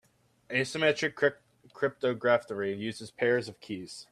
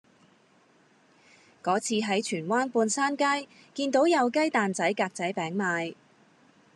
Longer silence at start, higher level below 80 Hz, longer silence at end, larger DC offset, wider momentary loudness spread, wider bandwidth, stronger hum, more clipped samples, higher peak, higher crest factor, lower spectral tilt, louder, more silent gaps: second, 0.5 s vs 1.65 s; first, -74 dBFS vs -86 dBFS; second, 0.1 s vs 0.8 s; neither; first, 12 LU vs 8 LU; about the same, 13 kHz vs 12 kHz; neither; neither; about the same, -12 dBFS vs -10 dBFS; about the same, 20 dB vs 18 dB; about the same, -4.5 dB/octave vs -4 dB/octave; second, -30 LUFS vs -27 LUFS; neither